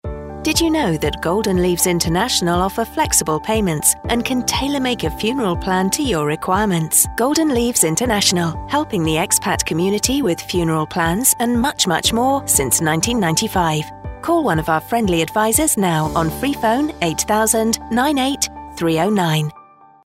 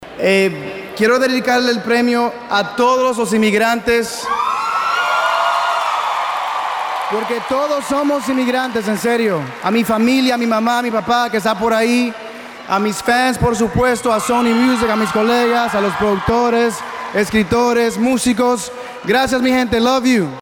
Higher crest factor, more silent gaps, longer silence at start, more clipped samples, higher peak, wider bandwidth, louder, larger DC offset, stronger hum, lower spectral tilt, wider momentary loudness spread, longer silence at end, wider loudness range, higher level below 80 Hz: about the same, 18 dB vs 14 dB; neither; about the same, 0.05 s vs 0 s; neither; about the same, 0 dBFS vs -2 dBFS; about the same, 16.5 kHz vs 18 kHz; about the same, -17 LUFS vs -16 LUFS; neither; neither; about the same, -3.5 dB/octave vs -4.5 dB/octave; about the same, 5 LU vs 6 LU; first, 0.45 s vs 0 s; about the same, 2 LU vs 2 LU; first, -36 dBFS vs -42 dBFS